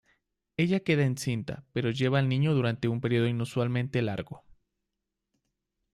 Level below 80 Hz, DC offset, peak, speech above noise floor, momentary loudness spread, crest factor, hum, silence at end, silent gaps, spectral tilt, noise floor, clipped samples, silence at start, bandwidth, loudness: -62 dBFS; under 0.1%; -12 dBFS; 57 dB; 9 LU; 18 dB; none; 1.55 s; none; -7 dB/octave; -85 dBFS; under 0.1%; 0.6 s; 12.5 kHz; -28 LUFS